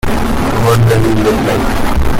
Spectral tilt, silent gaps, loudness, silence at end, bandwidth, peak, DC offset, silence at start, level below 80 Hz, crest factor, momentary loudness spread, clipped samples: -6.5 dB/octave; none; -12 LUFS; 0 s; 16.5 kHz; -2 dBFS; under 0.1%; 0.05 s; -18 dBFS; 8 dB; 5 LU; under 0.1%